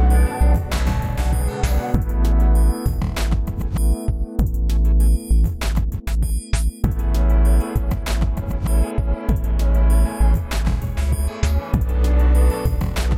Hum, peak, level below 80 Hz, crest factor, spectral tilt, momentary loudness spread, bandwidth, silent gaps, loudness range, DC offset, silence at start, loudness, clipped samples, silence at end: none; -4 dBFS; -18 dBFS; 14 dB; -6.5 dB/octave; 6 LU; 15.5 kHz; none; 1 LU; under 0.1%; 0 s; -20 LUFS; under 0.1%; 0 s